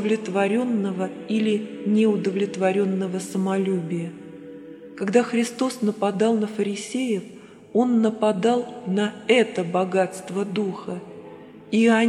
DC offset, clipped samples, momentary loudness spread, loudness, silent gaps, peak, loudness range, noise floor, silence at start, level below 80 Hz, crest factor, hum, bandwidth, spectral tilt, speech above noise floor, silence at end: under 0.1%; under 0.1%; 15 LU; -23 LUFS; none; -4 dBFS; 2 LU; -42 dBFS; 0 s; -72 dBFS; 18 dB; none; 12.5 kHz; -6 dB/octave; 20 dB; 0 s